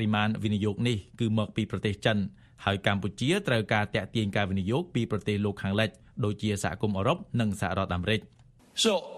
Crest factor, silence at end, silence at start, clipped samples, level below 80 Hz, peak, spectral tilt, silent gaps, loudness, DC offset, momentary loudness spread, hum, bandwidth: 20 dB; 0 s; 0 s; under 0.1%; -56 dBFS; -8 dBFS; -5.5 dB/octave; none; -29 LUFS; under 0.1%; 5 LU; none; 13.5 kHz